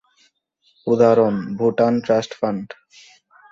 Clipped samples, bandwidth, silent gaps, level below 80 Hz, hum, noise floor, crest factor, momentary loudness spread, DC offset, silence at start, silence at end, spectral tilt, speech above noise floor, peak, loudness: under 0.1%; 7.6 kHz; none; -62 dBFS; none; -63 dBFS; 18 dB; 15 LU; under 0.1%; 0.85 s; 0.85 s; -7 dB/octave; 46 dB; -2 dBFS; -19 LUFS